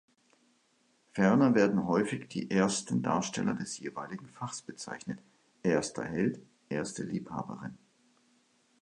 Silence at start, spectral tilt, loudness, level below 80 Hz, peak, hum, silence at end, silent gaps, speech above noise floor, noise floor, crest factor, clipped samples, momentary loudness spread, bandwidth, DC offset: 1.15 s; -5.5 dB/octave; -32 LUFS; -68 dBFS; -10 dBFS; none; 1.05 s; none; 40 dB; -71 dBFS; 22 dB; under 0.1%; 16 LU; 11 kHz; under 0.1%